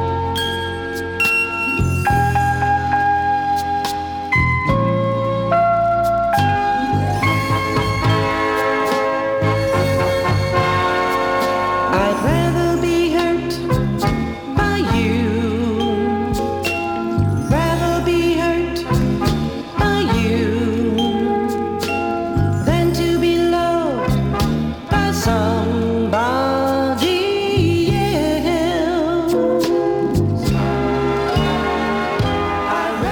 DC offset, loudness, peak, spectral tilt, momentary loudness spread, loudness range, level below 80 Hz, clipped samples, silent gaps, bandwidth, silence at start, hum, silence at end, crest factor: under 0.1%; -18 LUFS; -2 dBFS; -6 dB/octave; 4 LU; 2 LU; -34 dBFS; under 0.1%; none; over 20 kHz; 0 s; none; 0 s; 16 dB